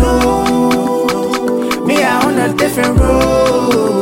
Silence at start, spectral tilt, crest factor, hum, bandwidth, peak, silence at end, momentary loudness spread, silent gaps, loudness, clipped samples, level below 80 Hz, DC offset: 0 s; -5.5 dB/octave; 12 dB; none; 16.5 kHz; 0 dBFS; 0 s; 4 LU; none; -13 LUFS; under 0.1%; -24 dBFS; under 0.1%